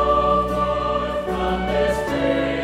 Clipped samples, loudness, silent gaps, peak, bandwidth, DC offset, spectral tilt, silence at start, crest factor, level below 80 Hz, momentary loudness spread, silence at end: under 0.1%; -21 LUFS; none; -6 dBFS; 15.5 kHz; under 0.1%; -6 dB/octave; 0 s; 14 dB; -34 dBFS; 5 LU; 0 s